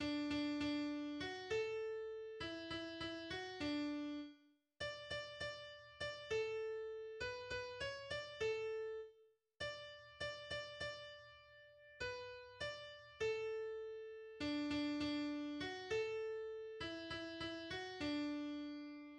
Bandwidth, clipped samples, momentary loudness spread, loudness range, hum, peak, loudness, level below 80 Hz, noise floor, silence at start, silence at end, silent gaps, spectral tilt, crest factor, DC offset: 10 kHz; under 0.1%; 11 LU; 5 LU; none; -30 dBFS; -45 LUFS; -70 dBFS; -72 dBFS; 0 s; 0 s; none; -4.5 dB/octave; 14 dB; under 0.1%